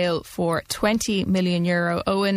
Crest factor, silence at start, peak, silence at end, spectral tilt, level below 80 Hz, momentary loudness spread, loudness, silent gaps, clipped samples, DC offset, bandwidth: 16 dB; 0 s; -6 dBFS; 0 s; -5 dB/octave; -48 dBFS; 4 LU; -23 LUFS; none; under 0.1%; under 0.1%; 15.5 kHz